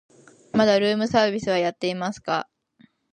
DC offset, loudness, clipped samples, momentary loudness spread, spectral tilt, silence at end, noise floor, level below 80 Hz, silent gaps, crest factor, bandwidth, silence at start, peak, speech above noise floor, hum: under 0.1%; -23 LUFS; under 0.1%; 9 LU; -5 dB/octave; 0.7 s; -59 dBFS; -60 dBFS; none; 18 dB; 9.8 kHz; 0.55 s; -4 dBFS; 37 dB; none